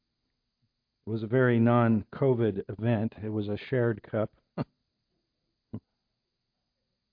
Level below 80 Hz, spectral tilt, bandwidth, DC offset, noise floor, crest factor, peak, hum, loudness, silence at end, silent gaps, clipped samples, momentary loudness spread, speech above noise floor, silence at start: -64 dBFS; -11.5 dB/octave; 5 kHz; under 0.1%; -82 dBFS; 18 dB; -12 dBFS; none; -28 LUFS; 1.35 s; none; under 0.1%; 21 LU; 55 dB; 1.05 s